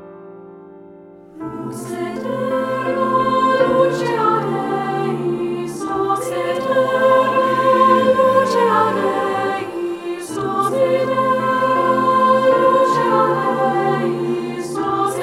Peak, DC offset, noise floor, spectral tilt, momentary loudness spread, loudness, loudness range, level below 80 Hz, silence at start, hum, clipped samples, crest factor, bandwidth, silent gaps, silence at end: -2 dBFS; under 0.1%; -41 dBFS; -5.5 dB/octave; 11 LU; -17 LUFS; 4 LU; -58 dBFS; 0 s; none; under 0.1%; 16 dB; 14.5 kHz; none; 0 s